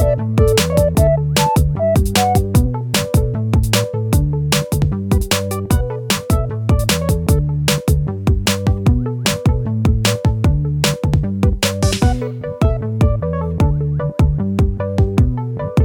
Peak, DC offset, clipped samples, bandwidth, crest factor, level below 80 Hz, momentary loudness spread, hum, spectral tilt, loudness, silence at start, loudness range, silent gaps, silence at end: 0 dBFS; under 0.1%; under 0.1%; over 20 kHz; 16 dB; -22 dBFS; 4 LU; none; -5.5 dB/octave; -17 LUFS; 0 s; 2 LU; none; 0 s